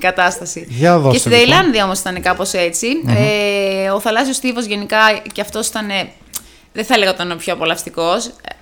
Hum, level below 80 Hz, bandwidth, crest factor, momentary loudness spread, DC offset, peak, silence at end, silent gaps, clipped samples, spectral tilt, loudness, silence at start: none; -44 dBFS; over 20 kHz; 16 dB; 13 LU; under 0.1%; 0 dBFS; 0.1 s; none; under 0.1%; -3.5 dB/octave; -14 LUFS; 0 s